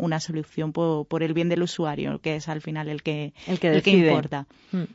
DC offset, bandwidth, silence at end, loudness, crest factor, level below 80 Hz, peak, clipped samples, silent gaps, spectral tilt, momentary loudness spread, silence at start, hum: under 0.1%; 8 kHz; 0.1 s; -25 LUFS; 18 dB; -60 dBFS; -6 dBFS; under 0.1%; none; -6.5 dB/octave; 13 LU; 0 s; none